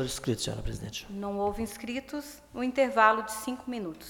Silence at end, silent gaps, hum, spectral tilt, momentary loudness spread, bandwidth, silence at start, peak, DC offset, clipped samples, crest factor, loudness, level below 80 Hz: 0 s; none; none; -4.5 dB/octave; 15 LU; 18.5 kHz; 0 s; -8 dBFS; under 0.1%; under 0.1%; 22 dB; -30 LUFS; -48 dBFS